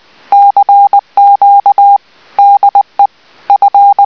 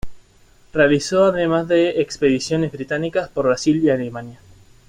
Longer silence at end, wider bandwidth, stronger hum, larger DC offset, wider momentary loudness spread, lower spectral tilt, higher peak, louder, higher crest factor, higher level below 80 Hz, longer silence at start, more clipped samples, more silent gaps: second, 0 s vs 0.55 s; second, 5.4 kHz vs 11 kHz; neither; first, 0.3% vs under 0.1%; about the same, 6 LU vs 8 LU; second, -3.5 dB/octave vs -5.5 dB/octave; about the same, 0 dBFS vs -2 dBFS; first, -7 LUFS vs -19 LUFS; second, 6 dB vs 16 dB; second, -62 dBFS vs -46 dBFS; first, 0.3 s vs 0.05 s; first, 3% vs under 0.1%; neither